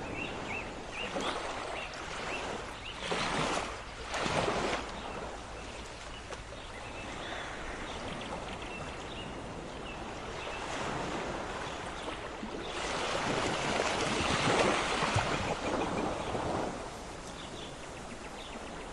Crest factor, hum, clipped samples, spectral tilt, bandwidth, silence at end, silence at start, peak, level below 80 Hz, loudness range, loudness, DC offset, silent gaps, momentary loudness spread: 22 dB; none; under 0.1%; -3.5 dB/octave; 12 kHz; 0 s; 0 s; -14 dBFS; -50 dBFS; 10 LU; -36 LUFS; under 0.1%; none; 13 LU